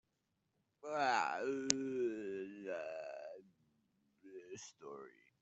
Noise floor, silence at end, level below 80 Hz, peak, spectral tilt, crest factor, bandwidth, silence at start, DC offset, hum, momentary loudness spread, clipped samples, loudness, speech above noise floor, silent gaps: -85 dBFS; 0.3 s; -86 dBFS; -8 dBFS; -2 dB/octave; 36 dB; 8 kHz; 0.85 s; under 0.1%; none; 19 LU; under 0.1%; -40 LUFS; 46 dB; none